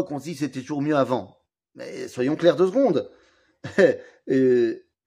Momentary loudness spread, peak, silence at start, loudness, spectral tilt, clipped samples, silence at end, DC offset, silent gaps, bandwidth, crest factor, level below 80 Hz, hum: 16 LU; -4 dBFS; 0 s; -22 LUFS; -6.5 dB/octave; under 0.1%; 0.3 s; under 0.1%; none; 11.5 kHz; 18 dB; -70 dBFS; none